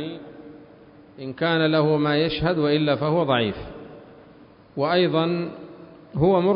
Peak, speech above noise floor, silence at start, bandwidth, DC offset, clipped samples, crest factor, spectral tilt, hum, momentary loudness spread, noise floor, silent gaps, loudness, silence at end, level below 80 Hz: -8 dBFS; 28 dB; 0 s; 5.4 kHz; under 0.1%; under 0.1%; 16 dB; -11 dB/octave; none; 21 LU; -49 dBFS; none; -22 LUFS; 0 s; -50 dBFS